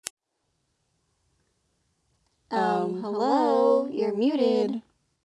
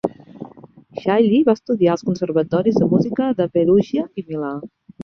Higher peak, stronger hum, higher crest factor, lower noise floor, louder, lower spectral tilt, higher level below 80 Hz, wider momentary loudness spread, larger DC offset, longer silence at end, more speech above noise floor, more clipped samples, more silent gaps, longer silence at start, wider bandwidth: about the same, -4 dBFS vs -2 dBFS; neither; first, 24 dB vs 16 dB; first, -76 dBFS vs -44 dBFS; second, -25 LUFS vs -18 LUFS; second, -5.5 dB/octave vs -8 dB/octave; second, -78 dBFS vs -56 dBFS; second, 9 LU vs 19 LU; neither; first, 0.5 s vs 0 s; first, 52 dB vs 27 dB; neither; neither; first, 2.5 s vs 0.05 s; first, 12 kHz vs 6.8 kHz